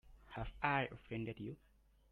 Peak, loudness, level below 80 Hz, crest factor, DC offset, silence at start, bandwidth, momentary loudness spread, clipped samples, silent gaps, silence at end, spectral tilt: -20 dBFS; -42 LUFS; -58 dBFS; 24 dB; under 0.1%; 0.05 s; 11 kHz; 15 LU; under 0.1%; none; 0.55 s; -8 dB/octave